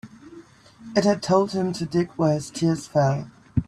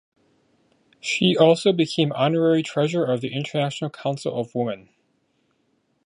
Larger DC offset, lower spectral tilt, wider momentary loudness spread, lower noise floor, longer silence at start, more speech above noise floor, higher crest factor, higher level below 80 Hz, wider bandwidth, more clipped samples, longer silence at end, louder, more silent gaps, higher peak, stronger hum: neither; about the same, -6.5 dB/octave vs -5.5 dB/octave; second, 6 LU vs 11 LU; second, -47 dBFS vs -68 dBFS; second, 0.05 s vs 1.05 s; second, 25 dB vs 47 dB; about the same, 18 dB vs 20 dB; first, -48 dBFS vs -68 dBFS; first, 12.5 kHz vs 11 kHz; neither; second, 0.05 s vs 1.3 s; about the same, -23 LUFS vs -22 LUFS; neither; about the same, -6 dBFS vs -4 dBFS; neither